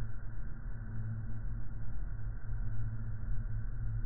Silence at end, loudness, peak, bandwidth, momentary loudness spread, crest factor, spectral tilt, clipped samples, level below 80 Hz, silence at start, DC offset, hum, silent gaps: 0 s; -43 LUFS; -22 dBFS; 2.1 kHz; 5 LU; 10 dB; -8.5 dB/octave; under 0.1%; -40 dBFS; 0 s; under 0.1%; none; none